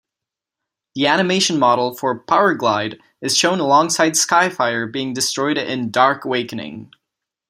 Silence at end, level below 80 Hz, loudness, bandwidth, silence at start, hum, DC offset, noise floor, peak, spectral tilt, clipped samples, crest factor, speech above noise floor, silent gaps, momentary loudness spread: 0.65 s; -66 dBFS; -17 LUFS; 16 kHz; 0.95 s; none; under 0.1%; -85 dBFS; -2 dBFS; -3 dB/octave; under 0.1%; 18 dB; 68 dB; none; 13 LU